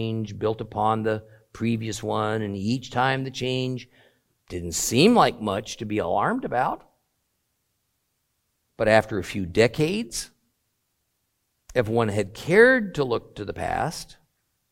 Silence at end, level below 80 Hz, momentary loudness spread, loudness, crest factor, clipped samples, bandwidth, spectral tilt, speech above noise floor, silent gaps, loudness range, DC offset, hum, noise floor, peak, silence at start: 0.65 s; -54 dBFS; 14 LU; -24 LUFS; 22 dB; under 0.1%; 16.5 kHz; -5 dB/octave; 51 dB; none; 4 LU; under 0.1%; none; -75 dBFS; -2 dBFS; 0 s